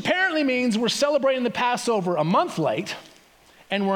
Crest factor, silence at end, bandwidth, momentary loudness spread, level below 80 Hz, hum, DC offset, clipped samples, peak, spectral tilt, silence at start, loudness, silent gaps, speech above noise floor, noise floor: 16 dB; 0 s; 18.5 kHz; 8 LU; -68 dBFS; none; under 0.1%; under 0.1%; -8 dBFS; -4.5 dB/octave; 0 s; -23 LUFS; none; 31 dB; -54 dBFS